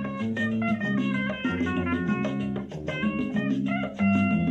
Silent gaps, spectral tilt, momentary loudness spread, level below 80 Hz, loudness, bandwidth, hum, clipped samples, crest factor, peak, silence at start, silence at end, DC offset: none; -7.5 dB/octave; 6 LU; -52 dBFS; -27 LUFS; 8 kHz; none; under 0.1%; 12 dB; -14 dBFS; 0 s; 0 s; under 0.1%